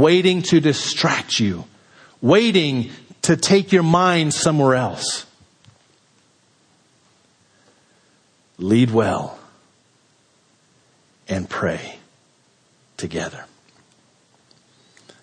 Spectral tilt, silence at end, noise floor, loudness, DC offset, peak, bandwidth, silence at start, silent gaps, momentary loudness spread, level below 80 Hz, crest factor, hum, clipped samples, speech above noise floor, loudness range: -5 dB/octave; 1.8 s; -59 dBFS; -18 LUFS; under 0.1%; -2 dBFS; 10.5 kHz; 0 s; none; 16 LU; -58 dBFS; 20 dB; none; under 0.1%; 42 dB; 14 LU